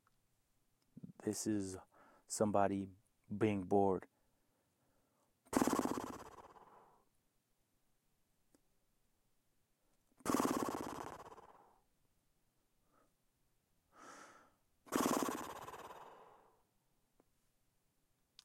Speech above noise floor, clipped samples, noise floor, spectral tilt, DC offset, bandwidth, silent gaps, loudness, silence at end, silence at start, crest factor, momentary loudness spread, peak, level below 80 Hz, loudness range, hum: 44 dB; under 0.1%; -81 dBFS; -5 dB/octave; under 0.1%; 16.5 kHz; none; -39 LUFS; 2.2 s; 1.05 s; 26 dB; 23 LU; -18 dBFS; -76 dBFS; 11 LU; none